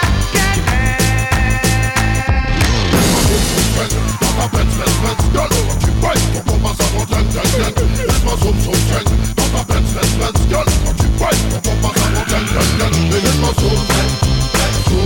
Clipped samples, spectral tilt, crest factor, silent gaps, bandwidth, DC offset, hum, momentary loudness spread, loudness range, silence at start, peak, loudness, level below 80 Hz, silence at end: under 0.1%; -4.5 dB/octave; 10 dB; none; 19 kHz; under 0.1%; none; 3 LU; 1 LU; 0 s; -2 dBFS; -15 LUFS; -18 dBFS; 0 s